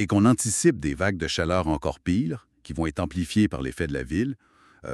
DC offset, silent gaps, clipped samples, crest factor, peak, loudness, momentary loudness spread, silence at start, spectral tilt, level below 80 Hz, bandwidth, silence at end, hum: under 0.1%; none; under 0.1%; 18 dB; -6 dBFS; -25 LUFS; 11 LU; 0 s; -5 dB/octave; -42 dBFS; 13.5 kHz; 0 s; none